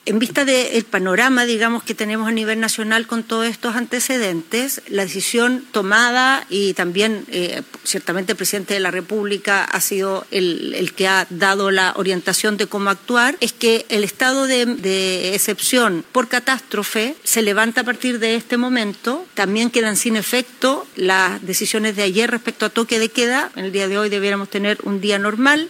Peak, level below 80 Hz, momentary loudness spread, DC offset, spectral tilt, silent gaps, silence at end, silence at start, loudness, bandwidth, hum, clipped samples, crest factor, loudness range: -2 dBFS; -72 dBFS; 6 LU; under 0.1%; -2.5 dB/octave; none; 0 s; 0.05 s; -18 LUFS; 16.5 kHz; none; under 0.1%; 16 dB; 2 LU